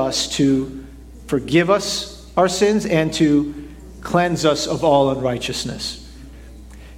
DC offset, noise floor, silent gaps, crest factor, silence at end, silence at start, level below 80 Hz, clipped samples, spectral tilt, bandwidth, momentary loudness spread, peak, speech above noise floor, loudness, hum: under 0.1%; -38 dBFS; none; 18 dB; 0 s; 0 s; -42 dBFS; under 0.1%; -4.5 dB/octave; 16 kHz; 13 LU; -2 dBFS; 20 dB; -19 LUFS; none